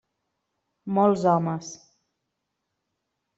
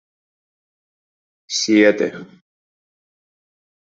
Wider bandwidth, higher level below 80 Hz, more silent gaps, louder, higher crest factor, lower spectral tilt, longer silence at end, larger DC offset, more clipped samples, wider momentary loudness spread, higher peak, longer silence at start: about the same, 8 kHz vs 7.8 kHz; about the same, -70 dBFS vs -70 dBFS; neither; second, -23 LUFS vs -17 LUFS; about the same, 20 dB vs 22 dB; first, -7 dB/octave vs -3.5 dB/octave; second, 1.6 s vs 1.75 s; neither; neither; first, 20 LU vs 12 LU; second, -8 dBFS vs -2 dBFS; second, 0.85 s vs 1.5 s